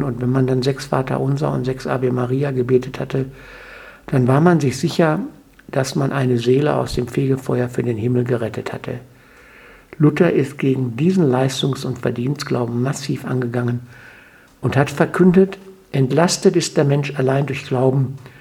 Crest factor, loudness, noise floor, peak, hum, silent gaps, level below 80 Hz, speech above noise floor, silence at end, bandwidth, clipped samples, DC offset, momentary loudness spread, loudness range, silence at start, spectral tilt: 18 dB; -19 LUFS; -46 dBFS; 0 dBFS; none; none; -48 dBFS; 29 dB; 0.1 s; 14.5 kHz; under 0.1%; under 0.1%; 11 LU; 4 LU; 0 s; -6.5 dB/octave